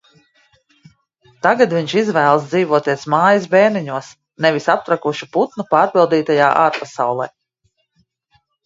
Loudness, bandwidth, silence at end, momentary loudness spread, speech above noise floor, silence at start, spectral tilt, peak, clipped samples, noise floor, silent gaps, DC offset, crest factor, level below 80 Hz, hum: -16 LUFS; 7.8 kHz; 1.4 s; 7 LU; 51 dB; 1.45 s; -5.5 dB/octave; 0 dBFS; under 0.1%; -66 dBFS; none; under 0.1%; 18 dB; -64 dBFS; none